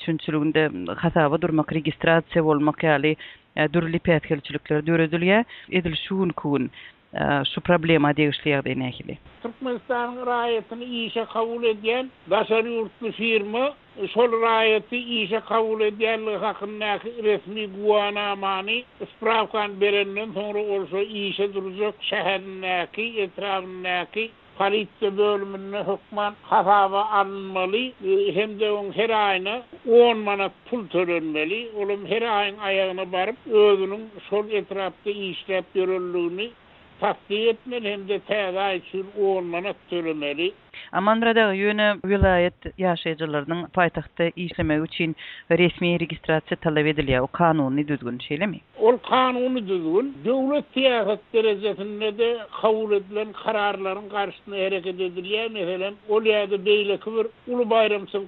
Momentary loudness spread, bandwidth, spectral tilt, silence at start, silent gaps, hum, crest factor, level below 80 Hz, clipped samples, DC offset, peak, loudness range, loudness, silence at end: 9 LU; 4.5 kHz; -10 dB/octave; 0 s; none; none; 20 dB; -50 dBFS; under 0.1%; under 0.1%; -4 dBFS; 4 LU; -23 LUFS; 0 s